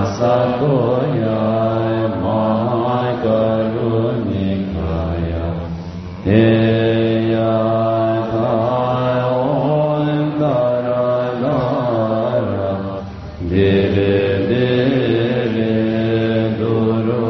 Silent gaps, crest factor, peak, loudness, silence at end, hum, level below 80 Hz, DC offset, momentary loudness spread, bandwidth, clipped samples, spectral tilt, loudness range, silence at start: none; 16 dB; -2 dBFS; -17 LUFS; 0 s; none; -40 dBFS; under 0.1%; 6 LU; 6.2 kHz; under 0.1%; -6.5 dB/octave; 2 LU; 0 s